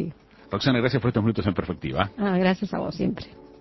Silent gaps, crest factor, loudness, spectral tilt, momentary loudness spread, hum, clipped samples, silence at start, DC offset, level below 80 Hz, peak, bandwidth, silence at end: none; 22 dB; -25 LUFS; -7.5 dB/octave; 10 LU; none; under 0.1%; 0 s; under 0.1%; -46 dBFS; -2 dBFS; 6 kHz; 0.05 s